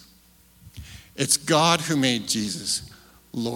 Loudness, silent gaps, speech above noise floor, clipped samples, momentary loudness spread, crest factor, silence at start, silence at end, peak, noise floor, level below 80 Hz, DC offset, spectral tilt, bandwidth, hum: -22 LUFS; none; 33 dB; under 0.1%; 21 LU; 22 dB; 0.65 s; 0 s; -4 dBFS; -56 dBFS; -56 dBFS; under 0.1%; -3 dB/octave; 18 kHz; none